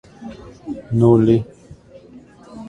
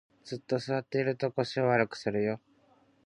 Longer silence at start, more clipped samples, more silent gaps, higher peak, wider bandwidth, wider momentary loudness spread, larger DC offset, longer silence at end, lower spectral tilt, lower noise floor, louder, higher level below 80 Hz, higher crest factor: about the same, 0.2 s vs 0.25 s; neither; neither; first, 0 dBFS vs -12 dBFS; second, 8.2 kHz vs 10.5 kHz; first, 23 LU vs 12 LU; neither; second, 0 s vs 0.7 s; first, -10 dB/octave vs -6.5 dB/octave; second, -43 dBFS vs -65 dBFS; first, -15 LUFS vs -31 LUFS; first, -46 dBFS vs -70 dBFS; about the same, 20 dB vs 20 dB